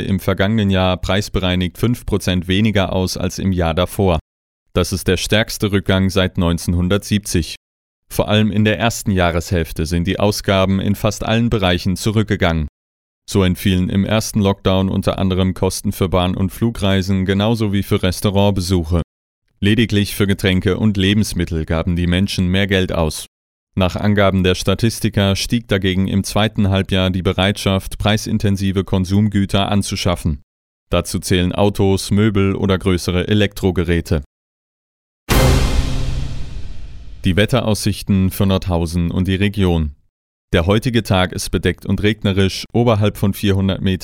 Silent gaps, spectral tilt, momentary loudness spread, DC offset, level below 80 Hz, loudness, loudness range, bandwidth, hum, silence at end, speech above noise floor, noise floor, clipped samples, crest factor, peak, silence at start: 4.21-4.66 s, 7.57-8.03 s, 12.69-13.22 s, 19.04-19.42 s, 23.28-23.67 s, 30.43-30.87 s, 34.26-35.27 s, 40.09-40.48 s; -5.5 dB/octave; 5 LU; under 0.1%; -30 dBFS; -17 LUFS; 2 LU; 17 kHz; none; 0 s; over 74 dB; under -90 dBFS; under 0.1%; 16 dB; -2 dBFS; 0 s